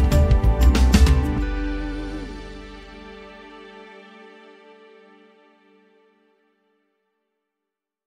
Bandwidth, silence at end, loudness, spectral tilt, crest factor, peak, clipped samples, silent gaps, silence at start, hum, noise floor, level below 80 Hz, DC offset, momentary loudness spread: 14 kHz; 4.4 s; -20 LUFS; -6.5 dB/octave; 20 dB; -2 dBFS; under 0.1%; none; 0 s; none; -85 dBFS; -24 dBFS; under 0.1%; 26 LU